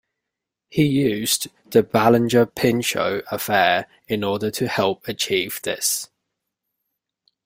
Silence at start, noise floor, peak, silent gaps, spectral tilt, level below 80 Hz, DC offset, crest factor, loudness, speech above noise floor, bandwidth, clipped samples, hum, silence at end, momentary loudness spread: 0.7 s; -84 dBFS; -2 dBFS; none; -4 dB/octave; -58 dBFS; under 0.1%; 20 dB; -20 LUFS; 63 dB; 16.5 kHz; under 0.1%; none; 1.4 s; 9 LU